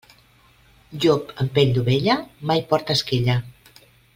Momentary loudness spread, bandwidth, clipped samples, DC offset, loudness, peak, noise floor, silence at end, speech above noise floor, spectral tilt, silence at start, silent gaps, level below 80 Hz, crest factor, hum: 5 LU; 16 kHz; under 0.1%; under 0.1%; -21 LUFS; -4 dBFS; -55 dBFS; 0.65 s; 35 dB; -6 dB/octave; 0.9 s; none; -50 dBFS; 18 dB; none